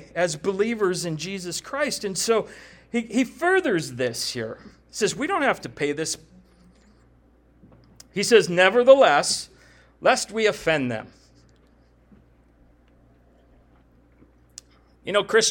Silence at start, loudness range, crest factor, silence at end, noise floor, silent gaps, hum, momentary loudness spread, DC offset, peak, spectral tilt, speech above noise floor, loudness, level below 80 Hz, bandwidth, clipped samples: 0 s; 10 LU; 22 dB; 0 s; -57 dBFS; none; none; 15 LU; under 0.1%; -2 dBFS; -3 dB/octave; 35 dB; -22 LUFS; -58 dBFS; 18 kHz; under 0.1%